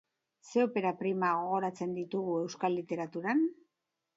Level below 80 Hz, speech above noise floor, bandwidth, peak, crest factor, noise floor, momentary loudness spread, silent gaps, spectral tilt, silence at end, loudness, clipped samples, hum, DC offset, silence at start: -84 dBFS; 54 dB; 8 kHz; -16 dBFS; 16 dB; -86 dBFS; 5 LU; none; -6.5 dB/octave; 0.65 s; -33 LUFS; under 0.1%; none; under 0.1%; 0.45 s